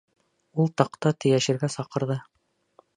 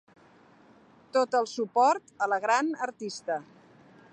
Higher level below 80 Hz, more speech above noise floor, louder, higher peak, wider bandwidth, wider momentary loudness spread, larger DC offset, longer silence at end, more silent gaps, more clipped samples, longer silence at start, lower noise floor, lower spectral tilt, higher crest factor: first, -70 dBFS vs -82 dBFS; first, 37 dB vs 30 dB; first, -25 LUFS vs -28 LUFS; first, -2 dBFS vs -12 dBFS; about the same, 10.5 kHz vs 10 kHz; about the same, 8 LU vs 10 LU; neither; about the same, 0.75 s vs 0.7 s; neither; neither; second, 0.55 s vs 1.15 s; first, -62 dBFS vs -58 dBFS; first, -6 dB/octave vs -3 dB/octave; first, 24 dB vs 18 dB